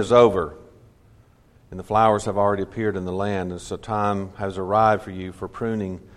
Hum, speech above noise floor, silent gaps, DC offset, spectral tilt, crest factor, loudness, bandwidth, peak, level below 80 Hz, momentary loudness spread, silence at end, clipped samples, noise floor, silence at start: none; 33 dB; none; under 0.1%; -6.5 dB/octave; 20 dB; -22 LUFS; 12 kHz; -2 dBFS; -50 dBFS; 14 LU; 0.15 s; under 0.1%; -54 dBFS; 0 s